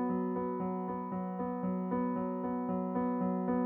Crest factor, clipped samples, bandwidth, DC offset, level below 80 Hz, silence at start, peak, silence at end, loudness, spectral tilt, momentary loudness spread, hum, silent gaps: 12 dB; under 0.1%; 3.2 kHz; under 0.1%; -66 dBFS; 0 s; -22 dBFS; 0 s; -35 LUFS; -12 dB/octave; 4 LU; none; none